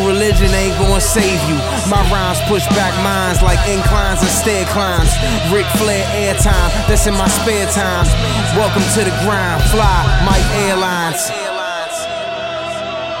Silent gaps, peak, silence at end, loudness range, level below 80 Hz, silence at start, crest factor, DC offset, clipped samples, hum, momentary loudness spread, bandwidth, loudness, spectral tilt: none; 0 dBFS; 0 s; 1 LU; -20 dBFS; 0 s; 14 dB; under 0.1%; under 0.1%; none; 7 LU; 16.5 kHz; -14 LUFS; -4 dB/octave